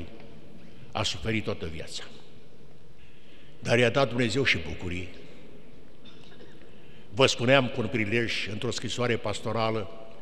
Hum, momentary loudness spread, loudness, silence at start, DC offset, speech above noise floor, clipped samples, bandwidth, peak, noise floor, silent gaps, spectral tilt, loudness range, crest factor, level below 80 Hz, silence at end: none; 17 LU; -27 LUFS; 0 s; 2%; 27 dB; under 0.1%; 12.5 kHz; -6 dBFS; -54 dBFS; none; -4.5 dB/octave; 8 LU; 24 dB; -54 dBFS; 0 s